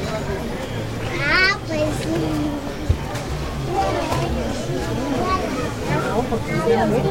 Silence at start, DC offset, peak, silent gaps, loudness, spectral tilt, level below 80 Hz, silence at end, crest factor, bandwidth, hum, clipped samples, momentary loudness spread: 0 s; under 0.1%; -4 dBFS; none; -22 LUFS; -5.5 dB/octave; -32 dBFS; 0 s; 18 dB; 16.5 kHz; none; under 0.1%; 8 LU